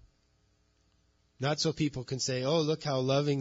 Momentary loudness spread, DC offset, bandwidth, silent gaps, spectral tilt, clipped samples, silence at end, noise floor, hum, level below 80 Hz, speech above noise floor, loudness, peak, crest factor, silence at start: 5 LU; under 0.1%; 7.8 kHz; none; -5 dB/octave; under 0.1%; 0 s; -70 dBFS; none; -64 dBFS; 40 dB; -31 LUFS; -16 dBFS; 16 dB; 1.4 s